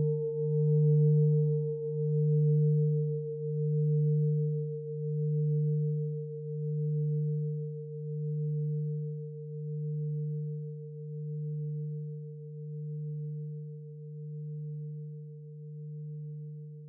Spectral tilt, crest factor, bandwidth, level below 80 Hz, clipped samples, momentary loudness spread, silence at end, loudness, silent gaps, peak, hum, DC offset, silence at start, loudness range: -17 dB/octave; 14 dB; 0.9 kHz; -90 dBFS; under 0.1%; 16 LU; 0 s; -32 LUFS; none; -18 dBFS; none; under 0.1%; 0 s; 13 LU